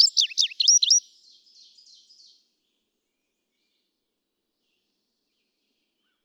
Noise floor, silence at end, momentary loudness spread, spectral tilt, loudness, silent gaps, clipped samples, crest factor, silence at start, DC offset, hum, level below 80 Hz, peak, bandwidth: -80 dBFS; 5.25 s; 5 LU; 9.5 dB/octave; -18 LUFS; none; under 0.1%; 22 dB; 0 s; under 0.1%; none; under -90 dBFS; -6 dBFS; 18.5 kHz